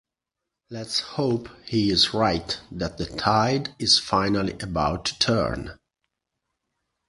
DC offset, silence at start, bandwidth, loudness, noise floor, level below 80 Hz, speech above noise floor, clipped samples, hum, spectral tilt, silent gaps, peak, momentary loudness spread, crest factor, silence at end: under 0.1%; 0.7 s; 11.5 kHz; -23 LUFS; -85 dBFS; -46 dBFS; 61 dB; under 0.1%; none; -4 dB/octave; none; -4 dBFS; 12 LU; 22 dB; 1.35 s